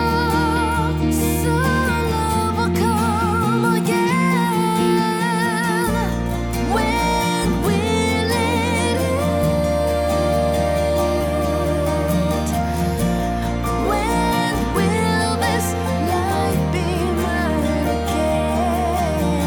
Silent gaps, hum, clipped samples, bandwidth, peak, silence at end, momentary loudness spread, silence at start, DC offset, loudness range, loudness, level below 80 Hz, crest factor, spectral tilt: none; none; under 0.1%; over 20 kHz; -6 dBFS; 0 s; 3 LU; 0 s; under 0.1%; 2 LU; -19 LUFS; -30 dBFS; 12 dB; -5.5 dB/octave